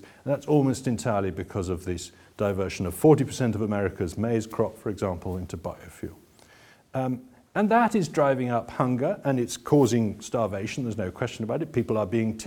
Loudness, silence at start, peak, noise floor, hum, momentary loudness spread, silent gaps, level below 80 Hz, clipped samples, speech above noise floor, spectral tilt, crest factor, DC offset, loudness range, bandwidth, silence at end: -26 LUFS; 0.05 s; -6 dBFS; -55 dBFS; none; 12 LU; none; -54 dBFS; under 0.1%; 29 dB; -6.5 dB/octave; 20 dB; under 0.1%; 7 LU; 18 kHz; 0 s